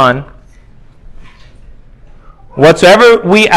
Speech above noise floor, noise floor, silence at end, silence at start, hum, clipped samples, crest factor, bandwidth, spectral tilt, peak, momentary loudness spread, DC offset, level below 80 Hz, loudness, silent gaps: 32 dB; -37 dBFS; 0 s; 0 s; none; 3%; 10 dB; 16 kHz; -4.5 dB/octave; 0 dBFS; 14 LU; under 0.1%; -38 dBFS; -6 LUFS; none